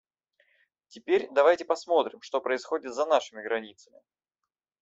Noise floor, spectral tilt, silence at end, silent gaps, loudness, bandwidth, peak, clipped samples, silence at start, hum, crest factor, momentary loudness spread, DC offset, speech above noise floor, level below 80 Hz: -88 dBFS; -3 dB/octave; 1.1 s; none; -27 LUFS; 8 kHz; -8 dBFS; under 0.1%; 0.95 s; none; 20 dB; 10 LU; under 0.1%; 60 dB; -78 dBFS